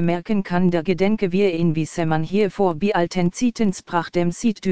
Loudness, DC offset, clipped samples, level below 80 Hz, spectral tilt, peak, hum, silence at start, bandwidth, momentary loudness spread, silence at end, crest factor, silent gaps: -21 LUFS; 2%; under 0.1%; -48 dBFS; -6.5 dB/octave; -4 dBFS; none; 0 s; 9.4 kHz; 4 LU; 0 s; 14 dB; none